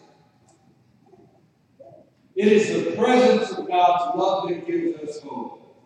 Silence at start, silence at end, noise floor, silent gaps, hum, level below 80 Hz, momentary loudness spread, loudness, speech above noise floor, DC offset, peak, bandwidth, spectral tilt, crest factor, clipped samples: 1.8 s; 0.3 s; -60 dBFS; none; none; -72 dBFS; 16 LU; -21 LUFS; 39 dB; under 0.1%; -4 dBFS; 10 kHz; -5.5 dB/octave; 18 dB; under 0.1%